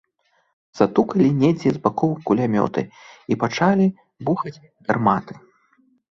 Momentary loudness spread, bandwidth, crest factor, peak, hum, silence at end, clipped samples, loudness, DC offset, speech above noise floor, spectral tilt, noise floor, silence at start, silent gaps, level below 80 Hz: 13 LU; 7.4 kHz; 20 dB; -2 dBFS; none; 0.75 s; under 0.1%; -20 LUFS; under 0.1%; 46 dB; -7.5 dB/octave; -66 dBFS; 0.75 s; none; -58 dBFS